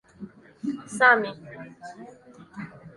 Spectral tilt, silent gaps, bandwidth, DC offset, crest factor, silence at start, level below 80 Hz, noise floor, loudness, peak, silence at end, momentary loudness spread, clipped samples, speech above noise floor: -4 dB/octave; none; 11.5 kHz; under 0.1%; 24 dB; 0.2 s; -68 dBFS; -45 dBFS; -23 LUFS; -4 dBFS; 0.05 s; 26 LU; under 0.1%; 21 dB